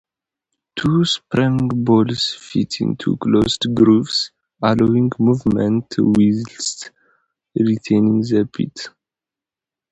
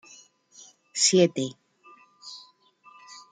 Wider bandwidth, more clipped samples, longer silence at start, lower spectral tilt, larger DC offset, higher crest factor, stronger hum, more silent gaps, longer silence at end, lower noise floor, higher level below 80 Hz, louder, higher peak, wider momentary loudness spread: about the same, 8.8 kHz vs 9.6 kHz; neither; second, 0.75 s vs 0.95 s; first, -6 dB/octave vs -3.5 dB/octave; neither; about the same, 18 dB vs 22 dB; neither; neither; about the same, 1 s vs 0.95 s; first, -89 dBFS vs -57 dBFS; first, -48 dBFS vs -78 dBFS; first, -17 LUFS vs -23 LUFS; first, 0 dBFS vs -8 dBFS; second, 11 LU vs 27 LU